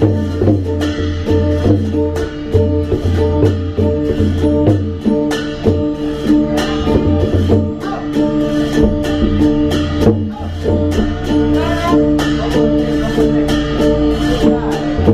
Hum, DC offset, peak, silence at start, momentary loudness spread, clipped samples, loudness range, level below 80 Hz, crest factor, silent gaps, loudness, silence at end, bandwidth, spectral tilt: none; under 0.1%; 0 dBFS; 0 s; 4 LU; under 0.1%; 1 LU; -26 dBFS; 14 dB; none; -15 LUFS; 0 s; 14 kHz; -7.5 dB/octave